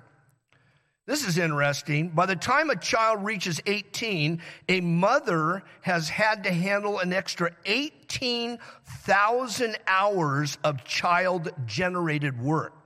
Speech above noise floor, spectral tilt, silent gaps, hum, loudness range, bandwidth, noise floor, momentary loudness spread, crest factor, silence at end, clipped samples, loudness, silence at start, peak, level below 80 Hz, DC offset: 40 dB; -4.5 dB/octave; none; none; 1 LU; 15.5 kHz; -66 dBFS; 7 LU; 16 dB; 0.15 s; under 0.1%; -26 LUFS; 1.05 s; -10 dBFS; -66 dBFS; under 0.1%